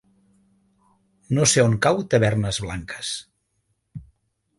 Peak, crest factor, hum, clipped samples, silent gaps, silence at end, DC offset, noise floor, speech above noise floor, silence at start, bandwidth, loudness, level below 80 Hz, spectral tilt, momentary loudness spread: -4 dBFS; 20 dB; none; under 0.1%; none; 0.55 s; under 0.1%; -72 dBFS; 51 dB; 1.3 s; 11.5 kHz; -21 LUFS; -48 dBFS; -4 dB/octave; 25 LU